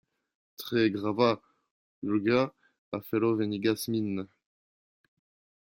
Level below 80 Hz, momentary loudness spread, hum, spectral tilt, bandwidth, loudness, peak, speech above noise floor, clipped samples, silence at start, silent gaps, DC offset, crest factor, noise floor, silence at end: -72 dBFS; 13 LU; none; -6 dB/octave; 16.5 kHz; -29 LUFS; -10 dBFS; over 62 dB; under 0.1%; 0.6 s; 1.71-2.02 s, 2.78-2.92 s; under 0.1%; 20 dB; under -90 dBFS; 1.4 s